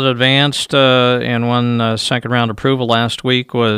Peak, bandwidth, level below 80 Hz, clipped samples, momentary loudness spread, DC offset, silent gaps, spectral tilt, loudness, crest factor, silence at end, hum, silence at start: 0 dBFS; 15 kHz; -52 dBFS; under 0.1%; 5 LU; under 0.1%; none; -5 dB/octave; -14 LUFS; 14 dB; 0 s; none; 0 s